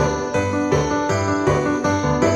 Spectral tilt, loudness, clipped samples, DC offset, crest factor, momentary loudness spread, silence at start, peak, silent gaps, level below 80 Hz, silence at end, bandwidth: -6 dB/octave; -20 LUFS; under 0.1%; under 0.1%; 16 dB; 2 LU; 0 s; -4 dBFS; none; -38 dBFS; 0 s; 12 kHz